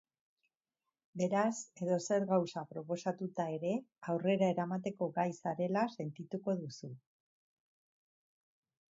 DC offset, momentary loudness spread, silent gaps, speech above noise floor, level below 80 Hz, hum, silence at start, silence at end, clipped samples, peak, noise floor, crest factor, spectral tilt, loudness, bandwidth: under 0.1%; 11 LU; none; over 54 dB; -84 dBFS; none; 1.15 s; 1.95 s; under 0.1%; -18 dBFS; under -90 dBFS; 20 dB; -6.5 dB/octave; -36 LUFS; 7.6 kHz